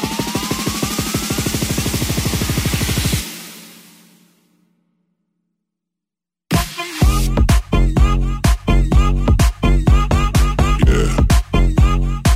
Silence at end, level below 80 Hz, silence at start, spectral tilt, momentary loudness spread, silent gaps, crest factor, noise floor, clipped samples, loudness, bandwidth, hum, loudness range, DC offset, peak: 0 s; -18 dBFS; 0 s; -5 dB/octave; 5 LU; none; 16 dB; -87 dBFS; under 0.1%; -17 LUFS; 16 kHz; none; 10 LU; under 0.1%; 0 dBFS